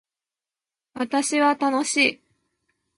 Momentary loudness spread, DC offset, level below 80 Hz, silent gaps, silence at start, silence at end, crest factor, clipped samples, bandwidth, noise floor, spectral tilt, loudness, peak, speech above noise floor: 6 LU; under 0.1%; -74 dBFS; none; 0.95 s; 0.8 s; 20 dB; under 0.1%; 11.5 kHz; under -90 dBFS; -1.5 dB/octave; -21 LUFS; -6 dBFS; over 68 dB